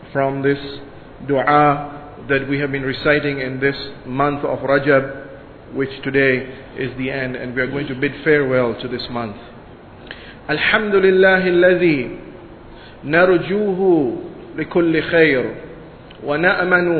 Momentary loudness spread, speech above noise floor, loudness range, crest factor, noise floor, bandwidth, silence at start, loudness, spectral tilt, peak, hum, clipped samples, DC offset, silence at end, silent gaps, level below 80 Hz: 20 LU; 22 dB; 5 LU; 18 dB; -39 dBFS; 4.6 kHz; 0 s; -17 LUFS; -9.5 dB/octave; 0 dBFS; none; under 0.1%; under 0.1%; 0 s; none; -46 dBFS